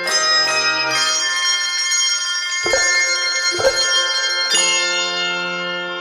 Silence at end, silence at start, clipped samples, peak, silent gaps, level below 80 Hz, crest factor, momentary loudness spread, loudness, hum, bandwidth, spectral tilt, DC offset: 0 s; 0 s; under 0.1%; -4 dBFS; none; -52 dBFS; 14 dB; 5 LU; -15 LUFS; none; 16 kHz; 1 dB/octave; under 0.1%